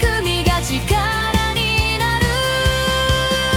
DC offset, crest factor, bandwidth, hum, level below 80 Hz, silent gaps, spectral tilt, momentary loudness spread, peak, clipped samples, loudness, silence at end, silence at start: under 0.1%; 14 dB; 18 kHz; none; -26 dBFS; none; -4 dB/octave; 2 LU; -4 dBFS; under 0.1%; -17 LUFS; 0 s; 0 s